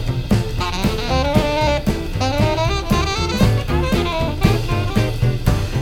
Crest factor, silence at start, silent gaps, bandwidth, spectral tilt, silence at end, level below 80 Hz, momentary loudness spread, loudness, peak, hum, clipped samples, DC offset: 16 dB; 0 s; none; 18 kHz; -6 dB/octave; 0 s; -24 dBFS; 4 LU; -19 LUFS; 0 dBFS; none; under 0.1%; under 0.1%